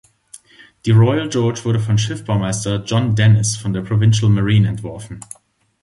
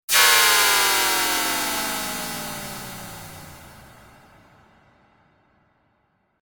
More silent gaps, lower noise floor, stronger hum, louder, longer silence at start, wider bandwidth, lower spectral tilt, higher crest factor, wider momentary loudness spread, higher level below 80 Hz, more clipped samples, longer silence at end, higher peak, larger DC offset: neither; second, -46 dBFS vs -68 dBFS; neither; about the same, -17 LUFS vs -18 LUFS; first, 0.35 s vs 0.1 s; second, 11.5 kHz vs 19.5 kHz; first, -6 dB/octave vs 0.5 dB/octave; second, 14 dB vs 22 dB; second, 15 LU vs 23 LU; first, -42 dBFS vs -56 dBFS; neither; second, 0.6 s vs 2.65 s; about the same, -2 dBFS vs -2 dBFS; neither